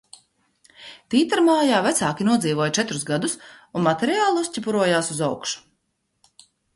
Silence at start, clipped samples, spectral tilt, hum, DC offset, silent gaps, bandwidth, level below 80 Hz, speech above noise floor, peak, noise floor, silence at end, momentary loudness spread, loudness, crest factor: 0.8 s; under 0.1%; -4 dB/octave; none; under 0.1%; none; 12 kHz; -64 dBFS; 52 dB; -6 dBFS; -73 dBFS; 1.15 s; 12 LU; -21 LUFS; 16 dB